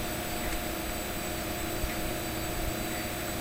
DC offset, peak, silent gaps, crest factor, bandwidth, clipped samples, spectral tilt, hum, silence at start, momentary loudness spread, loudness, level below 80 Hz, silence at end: 0.2%; -18 dBFS; none; 16 dB; 16 kHz; under 0.1%; -3.5 dB/octave; none; 0 s; 1 LU; -33 LUFS; -40 dBFS; 0 s